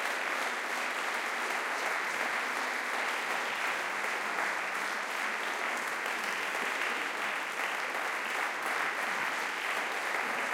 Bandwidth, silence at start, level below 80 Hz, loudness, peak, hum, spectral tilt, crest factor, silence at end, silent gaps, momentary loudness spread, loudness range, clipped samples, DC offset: 17 kHz; 0 s; -90 dBFS; -32 LUFS; -18 dBFS; none; -0.5 dB/octave; 16 dB; 0 s; none; 1 LU; 1 LU; under 0.1%; under 0.1%